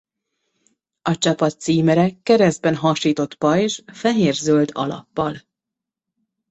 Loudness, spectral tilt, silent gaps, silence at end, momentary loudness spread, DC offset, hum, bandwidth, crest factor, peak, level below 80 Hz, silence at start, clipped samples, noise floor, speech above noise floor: -19 LUFS; -5.5 dB/octave; none; 1.1 s; 9 LU; under 0.1%; none; 8.2 kHz; 16 dB; -4 dBFS; -58 dBFS; 1.05 s; under 0.1%; -85 dBFS; 67 dB